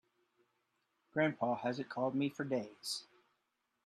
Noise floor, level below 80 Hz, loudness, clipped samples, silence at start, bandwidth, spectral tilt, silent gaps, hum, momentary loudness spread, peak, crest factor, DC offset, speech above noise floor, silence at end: -84 dBFS; -84 dBFS; -38 LUFS; under 0.1%; 1.15 s; 13 kHz; -5 dB/octave; none; none; 7 LU; -20 dBFS; 20 dB; under 0.1%; 47 dB; 0.8 s